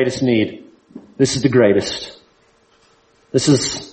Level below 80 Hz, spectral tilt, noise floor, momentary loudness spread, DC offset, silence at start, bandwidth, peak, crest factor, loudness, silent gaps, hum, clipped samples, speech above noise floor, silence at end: -50 dBFS; -5 dB/octave; -56 dBFS; 11 LU; under 0.1%; 0 s; 8.8 kHz; -2 dBFS; 18 dB; -17 LUFS; none; none; under 0.1%; 40 dB; 0.05 s